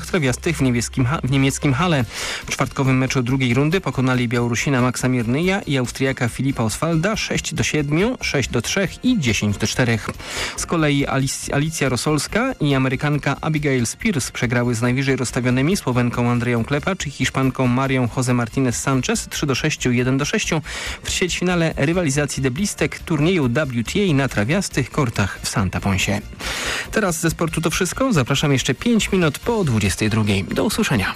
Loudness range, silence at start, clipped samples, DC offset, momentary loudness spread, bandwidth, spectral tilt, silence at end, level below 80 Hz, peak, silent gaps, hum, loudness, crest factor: 1 LU; 0 s; under 0.1%; under 0.1%; 4 LU; 15.5 kHz; -5 dB/octave; 0 s; -38 dBFS; -10 dBFS; none; none; -20 LUFS; 10 dB